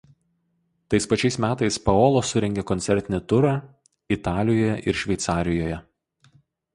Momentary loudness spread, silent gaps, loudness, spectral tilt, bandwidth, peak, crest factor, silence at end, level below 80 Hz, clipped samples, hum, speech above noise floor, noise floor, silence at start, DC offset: 8 LU; none; -23 LUFS; -5.5 dB/octave; 11.5 kHz; -4 dBFS; 20 dB; 0.95 s; -42 dBFS; under 0.1%; none; 49 dB; -71 dBFS; 0.9 s; under 0.1%